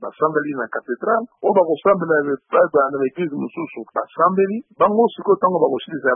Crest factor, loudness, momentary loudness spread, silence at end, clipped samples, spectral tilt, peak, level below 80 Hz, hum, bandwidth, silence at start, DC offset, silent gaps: 16 dB; -19 LUFS; 10 LU; 0 s; under 0.1%; -11.5 dB/octave; -2 dBFS; -66 dBFS; none; 3.7 kHz; 0 s; under 0.1%; none